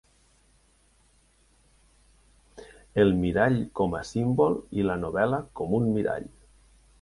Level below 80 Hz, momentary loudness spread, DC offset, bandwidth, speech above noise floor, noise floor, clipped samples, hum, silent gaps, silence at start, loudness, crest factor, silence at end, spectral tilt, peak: -50 dBFS; 8 LU; under 0.1%; 11.5 kHz; 38 dB; -63 dBFS; under 0.1%; none; none; 2.55 s; -26 LUFS; 20 dB; 0.75 s; -7.5 dB/octave; -8 dBFS